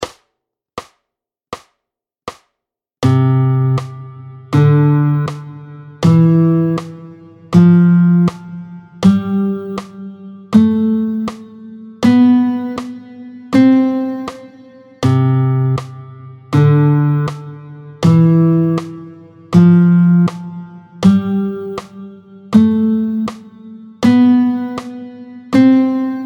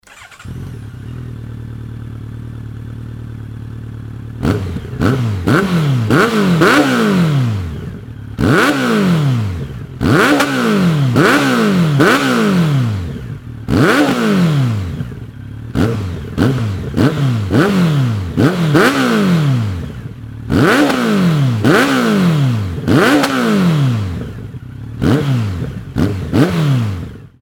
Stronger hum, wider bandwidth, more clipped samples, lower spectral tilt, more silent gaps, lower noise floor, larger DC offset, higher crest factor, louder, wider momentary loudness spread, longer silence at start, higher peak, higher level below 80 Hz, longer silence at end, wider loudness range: neither; second, 8.6 kHz vs 17.5 kHz; neither; first, -8.5 dB/octave vs -6.5 dB/octave; neither; first, -81 dBFS vs -34 dBFS; neither; about the same, 14 dB vs 14 dB; about the same, -13 LUFS vs -14 LUFS; first, 23 LU vs 18 LU; about the same, 0 s vs 0.1 s; about the same, 0 dBFS vs 0 dBFS; second, -52 dBFS vs -36 dBFS; second, 0 s vs 0.15 s; second, 4 LU vs 9 LU